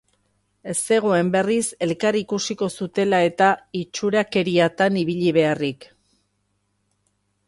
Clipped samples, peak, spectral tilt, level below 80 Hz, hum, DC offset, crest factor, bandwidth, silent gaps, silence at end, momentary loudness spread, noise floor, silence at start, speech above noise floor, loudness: under 0.1%; -4 dBFS; -4.5 dB/octave; -64 dBFS; 50 Hz at -50 dBFS; under 0.1%; 18 dB; 11.5 kHz; none; 1.65 s; 8 LU; -70 dBFS; 0.65 s; 50 dB; -21 LUFS